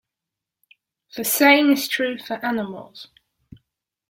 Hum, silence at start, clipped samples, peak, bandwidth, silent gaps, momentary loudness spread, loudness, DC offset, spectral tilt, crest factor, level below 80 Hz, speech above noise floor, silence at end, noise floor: none; 1.15 s; under 0.1%; -2 dBFS; 17 kHz; none; 23 LU; -19 LUFS; under 0.1%; -2.5 dB/octave; 22 dB; -68 dBFS; 65 dB; 1.05 s; -86 dBFS